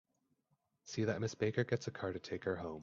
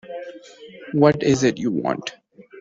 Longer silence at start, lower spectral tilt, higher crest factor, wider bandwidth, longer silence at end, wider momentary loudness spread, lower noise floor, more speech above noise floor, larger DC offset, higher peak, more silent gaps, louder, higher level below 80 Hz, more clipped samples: first, 0.85 s vs 0.05 s; about the same, -6 dB/octave vs -6 dB/octave; about the same, 20 dB vs 20 dB; about the same, 7.6 kHz vs 7.8 kHz; about the same, 0 s vs 0 s; second, 6 LU vs 22 LU; first, -82 dBFS vs -42 dBFS; first, 43 dB vs 23 dB; neither; second, -20 dBFS vs -2 dBFS; neither; second, -39 LUFS vs -20 LUFS; second, -72 dBFS vs -56 dBFS; neither